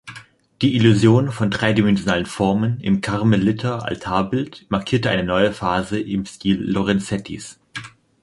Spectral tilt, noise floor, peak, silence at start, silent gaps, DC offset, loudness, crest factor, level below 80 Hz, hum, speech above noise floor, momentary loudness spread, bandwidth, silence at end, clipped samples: -6.5 dB/octave; -43 dBFS; -2 dBFS; 0.05 s; none; under 0.1%; -19 LUFS; 18 dB; -46 dBFS; none; 24 dB; 11 LU; 11.5 kHz; 0.35 s; under 0.1%